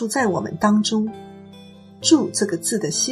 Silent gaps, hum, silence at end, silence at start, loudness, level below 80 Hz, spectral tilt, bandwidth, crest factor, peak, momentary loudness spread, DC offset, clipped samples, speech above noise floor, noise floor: none; none; 0 s; 0 s; -20 LUFS; -62 dBFS; -3.5 dB/octave; 14.5 kHz; 18 dB; -4 dBFS; 10 LU; under 0.1%; under 0.1%; 23 dB; -43 dBFS